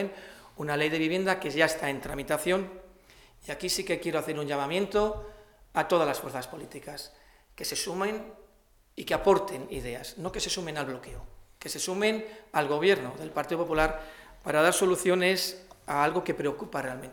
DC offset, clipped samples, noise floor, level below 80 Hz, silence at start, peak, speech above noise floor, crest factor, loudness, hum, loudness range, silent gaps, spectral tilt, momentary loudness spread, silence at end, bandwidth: under 0.1%; under 0.1%; -62 dBFS; -52 dBFS; 0 s; -8 dBFS; 33 dB; 22 dB; -29 LUFS; none; 5 LU; none; -3.5 dB/octave; 17 LU; 0 s; 19 kHz